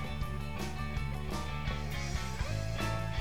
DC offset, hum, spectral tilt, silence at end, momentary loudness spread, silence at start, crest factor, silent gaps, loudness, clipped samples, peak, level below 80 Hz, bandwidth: 0.7%; none; -5 dB/octave; 0 s; 3 LU; 0 s; 14 dB; none; -37 LUFS; under 0.1%; -22 dBFS; -40 dBFS; 19 kHz